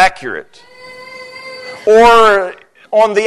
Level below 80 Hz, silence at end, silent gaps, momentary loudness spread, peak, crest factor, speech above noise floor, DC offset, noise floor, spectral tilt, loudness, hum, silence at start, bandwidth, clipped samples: -42 dBFS; 0 s; none; 23 LU; 0 dBFS; 12 dB; 23 dB; under 0.1%; -33 dBFS; -3 dB/octave; -9 LUFS; none; 0 s; 12.5 kHz; under 0.1%